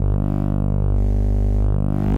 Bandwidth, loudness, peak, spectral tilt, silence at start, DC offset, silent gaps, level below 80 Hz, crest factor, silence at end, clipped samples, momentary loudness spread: 3 kHz; -21 LUFS; -10 dBFS; -10.5 dB/octave; 0 s; 0.2%; none; -20 dBFS; 8 dB; 0 s; under 0.1%; 1 LU